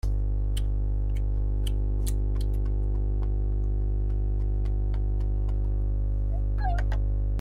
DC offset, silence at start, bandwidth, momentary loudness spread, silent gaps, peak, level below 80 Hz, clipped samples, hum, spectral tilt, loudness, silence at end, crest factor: under 0.1%; 0.05 s; 10.5 kHz; 1 LU; none; -16 dBFS; -26 dBFS; under 0.1%; 50 Hz at -25 dBFS; -7.5 dB/octave; -29 LUFS; 0 s; 10 dB